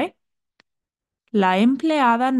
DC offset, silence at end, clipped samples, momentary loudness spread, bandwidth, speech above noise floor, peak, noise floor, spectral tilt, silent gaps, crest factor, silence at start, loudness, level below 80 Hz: under 0.1%; 0 s; under 0.1%; 8 LU; 12 kHz; 69 dB; -4 dBFS; -86 dBFS; -6.5 dB/octave; none; 16 dB; 0 s; -19 LUFS; -72 dBFS